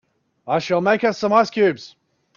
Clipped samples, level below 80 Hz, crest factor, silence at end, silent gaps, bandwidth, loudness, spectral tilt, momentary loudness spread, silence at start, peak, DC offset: under 0.1%; -64 dBFS; 18 dB; 0.5 s; none; 7.2 kHz; -19 LUFS; -5.5 dB/octave; 7 LU; 0.45 s; -4 dBFS; under 0.1%